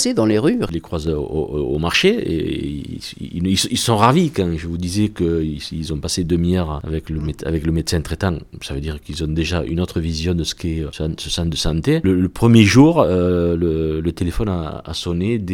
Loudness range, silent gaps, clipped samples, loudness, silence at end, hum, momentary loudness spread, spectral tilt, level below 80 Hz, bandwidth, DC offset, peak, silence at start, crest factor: 7 LU; none; under 0.1%; -19 LUFS; 0 s; none; 12 LU; -5.5 dB/octave; -32 dBFS; 17 kHz; under 0.1%; 0 dBFS; 0 s; 18 dB